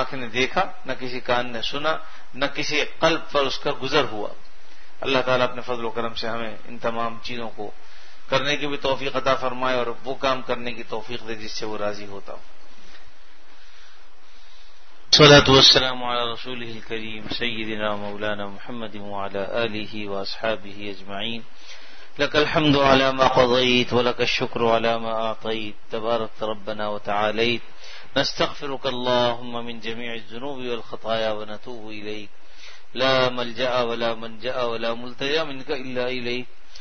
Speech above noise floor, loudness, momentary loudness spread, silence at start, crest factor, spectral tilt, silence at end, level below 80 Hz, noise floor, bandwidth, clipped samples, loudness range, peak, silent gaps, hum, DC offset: 28 dB; -22 LUFS; 16 LU; 0 s; 22 dB; -4 dB/octave; 0 s; -48 dBFS; -52 dBFS; 6.6 kHz; under 0.1%; 13 LU; 0 dBFS; none; none; 4%